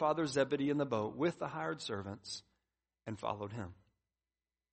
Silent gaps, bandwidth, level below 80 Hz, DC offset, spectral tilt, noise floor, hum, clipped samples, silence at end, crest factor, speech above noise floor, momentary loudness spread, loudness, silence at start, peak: none; 8.4 kHz; -72 dBFS; under 0.1%; -5.5 dB/octave; under -90 dBFS; none; under 0.1%; 1 s; 20 dB; over 53 dB; 13 LU; -38 LUFS; 0 s; -20 dBFS